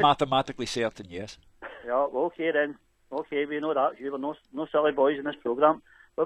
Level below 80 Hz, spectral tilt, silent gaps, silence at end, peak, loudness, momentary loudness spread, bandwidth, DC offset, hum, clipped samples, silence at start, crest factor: -62 dBFS; -5 dB/octave; none; 0 s; -8 dBFS; -27 LUFS; 16 LU; 11.5 kHz; under 0.1%; none; under 0.1%; 0 s; 20 dB